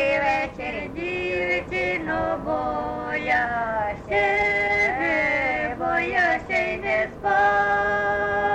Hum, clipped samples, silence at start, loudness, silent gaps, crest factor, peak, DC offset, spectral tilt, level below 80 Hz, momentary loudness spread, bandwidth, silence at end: none; under 0.1%; 0 s; -23 LUFS; none; 14 dB; -10 dBFS; under 0.1%; -5.5 dB/octave; -46 dBFS; 7 LU; 9.4 kHz; 0 s